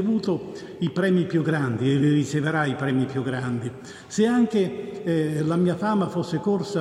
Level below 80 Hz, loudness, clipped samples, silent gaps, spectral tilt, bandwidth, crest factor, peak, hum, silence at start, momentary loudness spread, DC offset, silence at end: -64 dBFS; -24 LUFS; under 0.1%; none; -7 dB/octave; 12 kHz; 14 dB; -8 dBFS; none; 0 s; 9 LU; under 0.1%; 0 s